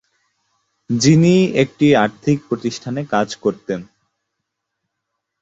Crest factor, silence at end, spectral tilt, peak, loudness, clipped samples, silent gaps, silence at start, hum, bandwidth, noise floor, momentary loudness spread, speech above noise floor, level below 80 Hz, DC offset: 16 dB; 1.6 s; -6 dB/octave; -2 dBFS; -17 LUFS; under 0.1%; none; 0.9 s; none; 8.2 kHz; -77 dBFS; 13 LU; 61 dB; -54 dBFS; under 0.1%